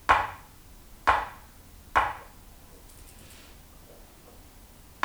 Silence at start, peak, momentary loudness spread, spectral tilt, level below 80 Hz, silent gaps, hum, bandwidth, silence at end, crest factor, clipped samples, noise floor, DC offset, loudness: 0.1 s; -4 dBFS; 26 LU; -3 dB/octave; -50 dBFS; none; none; over 20 kHz; 2.8 s; 28 dB; under 0.1%; -51 dBFS; under 0.1%; -27 LUFS